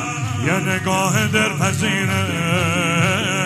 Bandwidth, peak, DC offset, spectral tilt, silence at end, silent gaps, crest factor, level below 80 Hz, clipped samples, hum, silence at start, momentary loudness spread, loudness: 15.5 kHz; -2 dBFS; under 0.1%; -4.5 dB/octave; 0 s; none; 16 dB; -50 dBFS; under 0.1%; none; 0 s; 3 LU; -18 LUFS